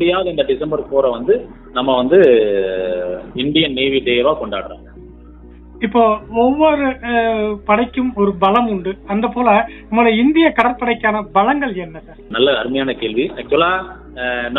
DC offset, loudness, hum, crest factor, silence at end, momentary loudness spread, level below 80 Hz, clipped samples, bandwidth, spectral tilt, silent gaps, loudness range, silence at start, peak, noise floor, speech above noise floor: under 0.1%; -16 LUFS; none; 16 dB; 0 s; 10 LU; -40 dBFS; under 0.1%; 4.1 kHz; -8 dB/octave; none; 3 LU; 0 s; 0 dBFS; -38 dBFS; 23 dB